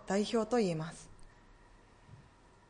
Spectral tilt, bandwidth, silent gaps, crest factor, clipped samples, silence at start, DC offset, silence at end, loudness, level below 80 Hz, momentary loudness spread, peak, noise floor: -5.5 dB/octave; 10.5 kHz; none; 18 dB; under 0.1%; 0 s; under 0.1%; 0.5 s; -34 LUFS; -62 dBFS; 21 LU; -20 dBFS; -61 dBFS